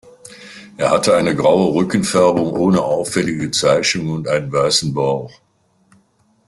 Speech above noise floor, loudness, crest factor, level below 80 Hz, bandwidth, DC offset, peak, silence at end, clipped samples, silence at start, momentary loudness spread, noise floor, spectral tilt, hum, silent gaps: 44 dB; -16 LUFS; 16 dB; -52 dBFS; 12.5 kHz; under 0.1%; -2 dBFS; 1.2 s; under 0.1%; 0.25 s; 7 LU; -59 dBFS; -4.5 dB/octave; none; none